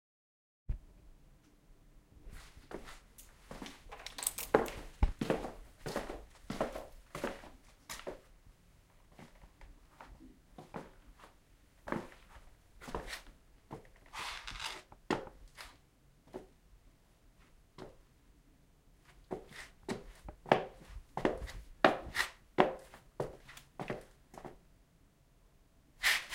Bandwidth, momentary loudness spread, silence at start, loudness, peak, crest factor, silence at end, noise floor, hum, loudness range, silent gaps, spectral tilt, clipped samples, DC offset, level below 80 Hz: 16 kHz; 25 LU; 0.7 s; -39 LUFS; -8 dBFS; 34 dB; 0 s; -67 dBFS; none; 18 LU; none; -3.5 dB/octave; under 0.1%; under 0.1%; -52 dBFS